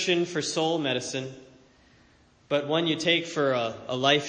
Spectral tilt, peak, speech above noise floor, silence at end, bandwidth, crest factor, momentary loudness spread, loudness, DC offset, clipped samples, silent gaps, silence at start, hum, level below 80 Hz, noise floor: -3.5 dB/octave; -8 dBFS; 33 dB; 0 s; 9.8 kHz; 20 dB; 8 LU; -26 LUFS; under 0.1%; under 0.1%; none; 0 s; none; -68 dBFS; -60 dBFS